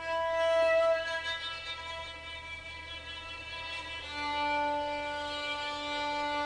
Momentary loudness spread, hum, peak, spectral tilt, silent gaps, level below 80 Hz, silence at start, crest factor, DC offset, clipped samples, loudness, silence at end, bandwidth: 13 LU; none; -18 dBFS; -3 dB/octave; none; -56 dBFS; 0 s; 14 dB; under 0.1%; under 0.1%; -33 LUFS; 0 s; 10.5 kHz